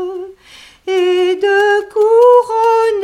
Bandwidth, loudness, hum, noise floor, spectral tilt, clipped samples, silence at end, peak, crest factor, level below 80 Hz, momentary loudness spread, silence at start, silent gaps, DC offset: 12 kHz; -12 LUFS; none; -41 dBFS; -2.5 dB/octave; under 0.1%; 0 s; 0 dBFS; 12 dB; -56 dBFS; 18 LU; 0 s; none; under 0.1%